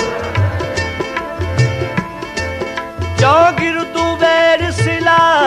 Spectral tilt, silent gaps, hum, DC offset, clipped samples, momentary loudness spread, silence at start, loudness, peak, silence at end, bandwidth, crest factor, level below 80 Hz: -5.5 dB/octave; none; none; under 0.1%; under 0.1%; 11 LU; 0 s; -15 LUFS; 0 dBFS; 0 s; 13.5 kHz; 14 dB; -36 dBFS